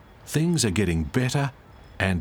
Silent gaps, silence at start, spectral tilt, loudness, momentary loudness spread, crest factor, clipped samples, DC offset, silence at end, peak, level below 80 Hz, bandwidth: none; 0.25 s; -5 dB/octave; -25 LUFS; 6 LU; 18 dB; under 0.1%; under 0.1%; 0 s; -6 dBFS; -42 dBFS; over 20 kHz